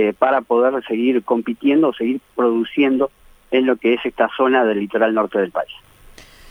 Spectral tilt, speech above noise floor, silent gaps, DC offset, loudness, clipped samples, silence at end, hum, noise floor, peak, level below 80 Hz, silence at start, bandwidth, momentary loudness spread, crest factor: -6.5 dB/octave; 27 dB; none; under 0.1%; -18 LUFS; under 0.1%; 0.3 s; none; -44 dBFS; -2 dBFS; -54 dBFS; 0 s; 14.5 kHz; 6 LU; 16 dB